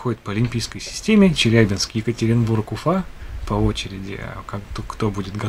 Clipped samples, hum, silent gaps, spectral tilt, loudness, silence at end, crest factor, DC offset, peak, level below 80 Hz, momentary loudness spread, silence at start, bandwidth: under 0.1%; none; none; -5.5 dB/octave; -20 LUFS; 0 s; 20 dB; under 0.1%; 0 dBFS; -36 dBFS; 16 LU; 0 s; 14.5 kHz